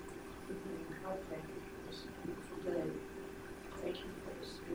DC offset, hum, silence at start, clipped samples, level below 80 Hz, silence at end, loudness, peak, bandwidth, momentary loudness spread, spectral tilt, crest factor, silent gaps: under 0.1%; none; 0 s; under 0.1%; -60 dBFS; 0 s; -45 LUFS; -28 dBFS; over 20 kHz; 8 LU; -5.5 dB/octave; 18 dB; none